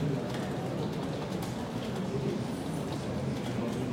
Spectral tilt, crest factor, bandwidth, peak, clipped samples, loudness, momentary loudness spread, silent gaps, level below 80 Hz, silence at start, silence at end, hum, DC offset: -6.5 dB/octave; 12 dB; 16.5 kHz; -20 dBFS; under 0.1%; -34 LUFS; 2 LU; none; -56 dBFS; 0 s; 0 s; none; under 0.1%